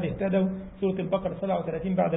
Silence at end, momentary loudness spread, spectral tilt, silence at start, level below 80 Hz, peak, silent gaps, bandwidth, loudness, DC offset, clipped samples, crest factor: 0 s; 4 LU; -12 dB/octave; 0 s; -50 dBFS; -12 dBFS; none; 3.9 kHz; -28 LUFS; under 0.1%; under 0.1%; 16 dB